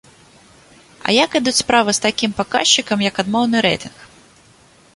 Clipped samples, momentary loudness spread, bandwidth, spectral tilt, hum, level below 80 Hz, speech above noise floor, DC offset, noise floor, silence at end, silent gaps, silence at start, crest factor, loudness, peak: under 0.1%; 6 LU; 11.5 kHz; -2.5 dB/octave; none; -52 dBFS; 33 dB; under 0.1%; -49 dBFS; 0.9 s; none; 1.05 s; 18 dB; -16 LUFS; 0 dBFS